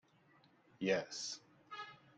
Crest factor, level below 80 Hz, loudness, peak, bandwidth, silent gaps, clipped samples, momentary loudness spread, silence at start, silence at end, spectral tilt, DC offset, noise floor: 22 dB; -84 dBFS; -42 LUFS; -22 dBFS; 9.4 kHz; none; under 0.1%; 14 LU; 0.8 s; 0.2 s; -3.5 dB/octave; under 0.1%; -70 dBFS